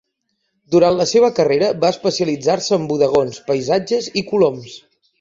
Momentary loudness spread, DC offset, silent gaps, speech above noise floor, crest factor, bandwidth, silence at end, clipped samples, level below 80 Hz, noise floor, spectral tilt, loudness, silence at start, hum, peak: 6 LU; under 0.1%; none; 55 dB; 16 dB; 7.8 kHz; 0.45 s; under 0.1%; -56 dBFS; -71 dBFS; -5 dB/octave; -17 LUFS; 0.7 s; none; -2 dBFS